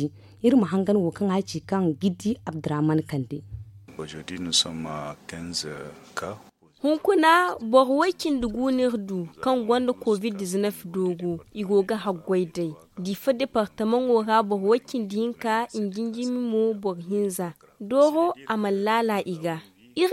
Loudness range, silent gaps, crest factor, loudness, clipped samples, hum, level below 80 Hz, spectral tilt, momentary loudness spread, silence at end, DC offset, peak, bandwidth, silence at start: 5 LU; none; 20 dB; -25 LUFS; under 0.1%; none; -58 dBFS; -5 dB/octave; 14 LU; 0 s; under 0.1%; -6 dBFS; 16.5 kHz; 0 s